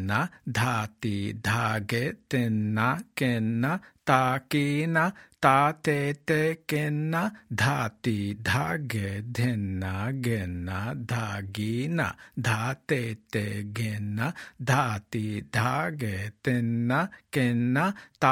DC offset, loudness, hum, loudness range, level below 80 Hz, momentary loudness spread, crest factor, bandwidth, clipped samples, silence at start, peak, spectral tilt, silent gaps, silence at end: under 0.1%; -28 LUFS; none; 5 LU; -62 dBFS; 7 LU; 22 dB; 16.5 kHz; under 0.1%; 0 s; -4 dBFS; -6 dB/octave; none; 0 s